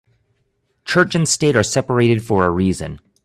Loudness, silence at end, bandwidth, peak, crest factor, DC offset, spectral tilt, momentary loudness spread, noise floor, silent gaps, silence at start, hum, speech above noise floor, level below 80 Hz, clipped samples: -17 LUFS; 0.3 s; 14 kHz; 0 dBFS; 18 dB; under 0.1%; -4.5 dB/octave; 9 LU; -67 dBFS; none; 0.85 s; none; 50 dB; -48 dBFS; under 0.1%